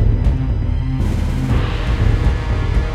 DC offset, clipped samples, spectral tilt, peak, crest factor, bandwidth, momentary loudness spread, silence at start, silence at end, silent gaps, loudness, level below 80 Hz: under 0.1%; under 0.1%; -7.5 dB/octave; -2 dBFS; 12 dB; 9.2 kHz; 3 LU; 0 s; 0 s; none; -19 LUFS; -18 dBFS